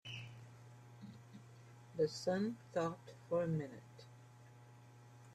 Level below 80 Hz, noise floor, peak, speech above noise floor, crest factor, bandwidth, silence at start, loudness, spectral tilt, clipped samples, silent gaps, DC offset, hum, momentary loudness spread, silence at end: -78 dBFS; -60 dBFS; -24 dBFS; 21 dB; 20 dB; 13.5 kHz; 0.05 s; -41 LUFS; -6.5 dB/octave; under 0.1%; none; under 0.1%; none; 23 LU; 0 s